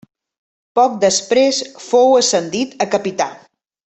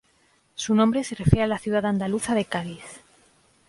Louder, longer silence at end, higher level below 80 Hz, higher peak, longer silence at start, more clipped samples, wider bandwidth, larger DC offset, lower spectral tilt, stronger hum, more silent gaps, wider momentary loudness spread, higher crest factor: first, -15 LUFS vs -24 LUFS; second, 0.55 s vs 0.7 s; second, -62 dBFS vs -42 dBFS; about the same, -2 dBFS vs 0 dBFS; first, 0.75 s vs 0.6 s; neither; second, 8.4 kHz vs 11.5 kHz; neither; second, -2.5 dB/octave vs -6 dB/octave; neither; neither; second, 10 LU vs 17 LU; second, 14 dB vs 24 dB